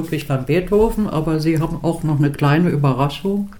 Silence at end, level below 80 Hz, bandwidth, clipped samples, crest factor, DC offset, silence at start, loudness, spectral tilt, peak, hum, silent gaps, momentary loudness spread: 0 s; -34 dBFS; 17.5 kHz; under 0.1%; 14 dB; 0.8%; 0 s; -18 LUFS; -7.5 dB/octave; -2 dBFS; none; none; 6 LU